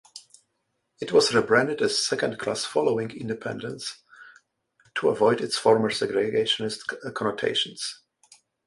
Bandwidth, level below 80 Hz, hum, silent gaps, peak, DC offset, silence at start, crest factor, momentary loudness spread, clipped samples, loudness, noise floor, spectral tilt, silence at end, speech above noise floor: 11.5 kHz; -66 dBFS; none; none; -6 dBFS; under 0.1%; 0.15 s; 20 dB; 13 LU; under 0.1%; -25 LUFS; -76 dBFS; -3.5 dB/octave; 0.7 s; 52 dB